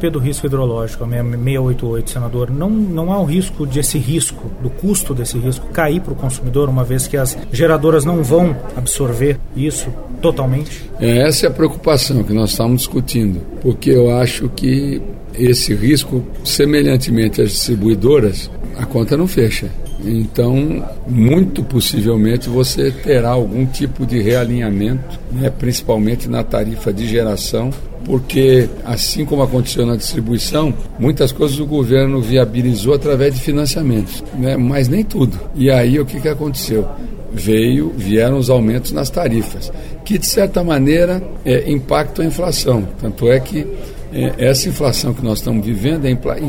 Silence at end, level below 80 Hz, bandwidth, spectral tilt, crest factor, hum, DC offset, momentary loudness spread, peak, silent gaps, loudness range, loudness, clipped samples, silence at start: 0 s; -26 dBFS; 17 kHz; -5.5 dB/octave; 14 dB; none; under 0.1%; 8 LU; 0 dBFS; none; 3 LU; -15 LUFS; under 0.1%; 0 s